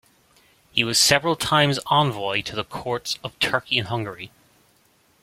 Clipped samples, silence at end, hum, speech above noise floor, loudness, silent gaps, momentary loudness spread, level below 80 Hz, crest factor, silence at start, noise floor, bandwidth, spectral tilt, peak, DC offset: under 0.1%; 0.95 s; none; 38 dB; -21 LUFS; none; 13 LU; -56 dBFS; 22 dB; 0.75 s; -61 dBFS; 16.5 kHz; -3 dB/octave; -2 dBFS; under 0.1%